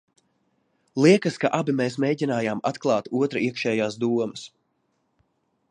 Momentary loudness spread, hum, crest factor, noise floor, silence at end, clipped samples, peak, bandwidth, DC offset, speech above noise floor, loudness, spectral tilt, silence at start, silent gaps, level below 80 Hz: 9 LU; none; 20 dB; -72 dBFS; 1.25 s; under 0.1%; -4 dBFS; 10.5 kHz; under 0.1%; 49 dB; -23 LUFS; -6 dB/octave; 0.95 s; none; -70 dBFS